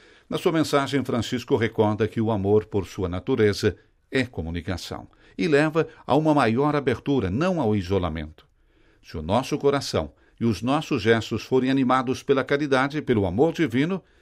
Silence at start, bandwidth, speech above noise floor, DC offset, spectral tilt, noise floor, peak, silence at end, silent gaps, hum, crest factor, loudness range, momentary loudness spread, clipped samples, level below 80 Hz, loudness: 0.3 s; 15.5 kHz; 36 dB; under 0.1%; -6.5 dB/octave; -59 dBFS; -6 dBFS; 0.2 s; none; none; 18 dB; 3 LU; 10 LU; under 0.1%; -48 dBFS; -24 LUFS